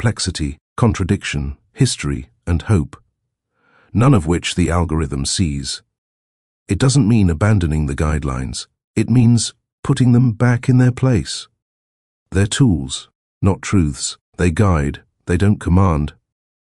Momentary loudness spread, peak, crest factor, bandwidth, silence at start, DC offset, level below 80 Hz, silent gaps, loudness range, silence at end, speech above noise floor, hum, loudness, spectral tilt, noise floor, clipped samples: 12 LU; 0 dBFS; 18 dB; 12 kHz; 0 s; under 0.1%; -32 dBFS; 0.61-0.76 s, 5.98-6.66 s, 8.84-8.94 s, 9.73-9.83 s, 11.62-12.26 s, 13.15-13.41 s, 14.21-14.32 s; 4 LU; 0.55 s; 57 dB; none; -17 LUFS; -6 dB/octave; -72 dBFS; under 0.1%